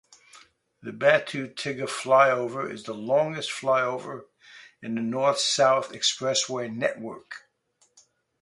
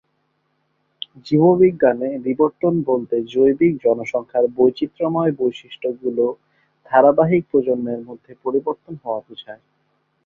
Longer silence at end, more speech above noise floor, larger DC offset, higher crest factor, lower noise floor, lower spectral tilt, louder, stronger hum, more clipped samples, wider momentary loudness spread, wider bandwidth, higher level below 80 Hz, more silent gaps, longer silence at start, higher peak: first, 1.05 s vs 0.7 s; second, 42 dB vs 50 dB; neither; about the same, 22 dB vs 18 dB; about the same, -68 dBFS vs -68 dBFS; second, -3 dB/octave vs -8.5 dB/octave; second, -25 LUFS vs -19 LUFS; neither; neither; first, 19 LU vs 15 LU; first, 11.5 kHz vs 7 kHz; second, -74 dBFS vs -60 dBFS; neither; second, 0.35 s vs 1.25 s; about the same, -4 dBFS vs -2 dBFS